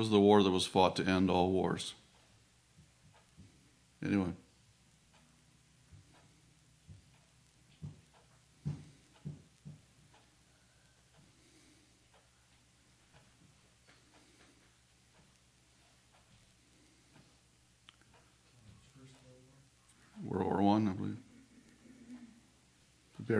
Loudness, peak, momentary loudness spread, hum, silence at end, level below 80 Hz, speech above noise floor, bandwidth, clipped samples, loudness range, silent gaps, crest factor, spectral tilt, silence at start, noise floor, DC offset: -32 LUFS; -12 dBFS; 29 LU; none; 0 s; -70 dBFS; 38 dB; 11 kHz; under 0.1%; 25 LU; none; 26 dB; -6 dB/octave; 0 s; -68 dBFS; under 0.1%